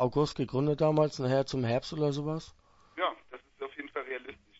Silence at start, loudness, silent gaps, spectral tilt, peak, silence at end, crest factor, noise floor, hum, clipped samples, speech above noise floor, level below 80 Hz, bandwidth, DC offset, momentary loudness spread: 0 s; -31 LUFS; none; -7 dB/octave; -14 dBFS; 0.25 s; 18 dB; -50 dBFS; none; under 0.1%; 21 dB; -58 dBFS; 8 kHz; under 0.1%; 16 LU